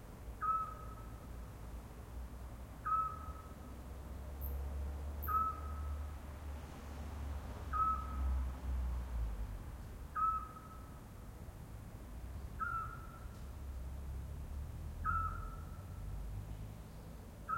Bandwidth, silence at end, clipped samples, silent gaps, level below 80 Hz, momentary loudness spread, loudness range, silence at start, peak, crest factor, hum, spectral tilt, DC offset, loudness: 16.5 kHz; 0 s; under 0.1%; none; -46 dBFS; 15 LU; 6 LU; 0 s; -26 dBFS; 18 dB; none; -6.5 dB/octave; under 0.1%; -43 LUFS